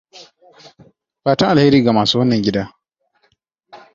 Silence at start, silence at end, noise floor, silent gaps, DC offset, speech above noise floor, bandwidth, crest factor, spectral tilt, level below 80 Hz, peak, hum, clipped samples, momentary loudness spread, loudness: 0.15 s; 0.2 s; -64 dBFS; none; under 0.1%; 50 dB; 7.6 kHz; 16 dB; -6 dB/octave; -50 dBFS; -2 dBFS; none; under 0.1%; 12 LU; -15 LUFS